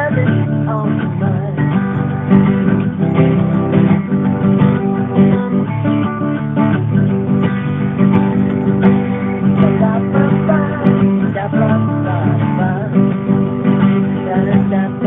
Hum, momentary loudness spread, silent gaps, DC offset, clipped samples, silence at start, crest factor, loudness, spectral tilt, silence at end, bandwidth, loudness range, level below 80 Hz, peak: none; 4 LU; none; under 0.1%; under 0.1%; 0 s; 14 dB; -14 LUFS; -12 dB/octave; 0 s; 3.8 kHz; 1 LU; -44 dBFS; 0 dBFS